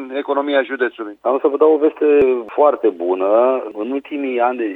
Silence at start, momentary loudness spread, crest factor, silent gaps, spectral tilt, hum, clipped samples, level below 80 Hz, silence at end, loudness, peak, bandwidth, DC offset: 0 s; 9 LU; 14 dB; none; -7 dB/octave; none; under 0.1%; -58 dBFS; 0 s; -17 LUFS; -2 dBFS; 4 kHz; under 0.1%